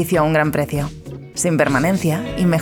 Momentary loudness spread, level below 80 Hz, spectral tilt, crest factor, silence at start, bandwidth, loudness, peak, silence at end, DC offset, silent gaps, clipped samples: 11 LU; -40 dBFS; -5.5 dB/octave; 16 dB; 0 s; 19.5 kHz; -18 LUFS; -2 dBFS; 0 s; under 0.1%; none; under 0.1%